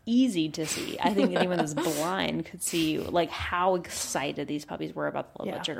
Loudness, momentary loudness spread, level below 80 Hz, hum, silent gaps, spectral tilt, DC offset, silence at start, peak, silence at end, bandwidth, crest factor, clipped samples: -29 LUFS; 9 LU; -56 dBFS; none; none; -4 dB/octave; under 0.1%; 0.05 s; -8 dBFS; 0 s; 16.5 kHz; 20 dB; under 0.1%